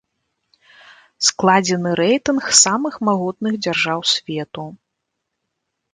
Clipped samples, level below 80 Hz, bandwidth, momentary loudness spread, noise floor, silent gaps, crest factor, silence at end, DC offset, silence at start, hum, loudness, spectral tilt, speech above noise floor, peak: under 0.1%; -60 dBFS; 11 kHz; 15 LU; -77 dBFS; none; 20 dB; 1.2 s; under 0.1%; 1.2 s; none; -17 LUFS; -2.5 dB/octave; 59 dB; 0 dBFS